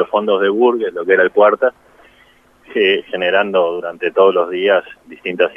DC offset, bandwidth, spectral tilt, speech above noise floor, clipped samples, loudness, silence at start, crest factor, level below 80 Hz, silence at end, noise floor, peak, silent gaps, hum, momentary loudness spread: under 0.1%; 5.2 kHz; -6.5 dB/octave; 35 dB; under 0.1%; -15 LUFS; 0 s; 16 dB; -62 dBFS; 0.05 s; -50 dBFS; 0 dBFS; none; none; 7 LU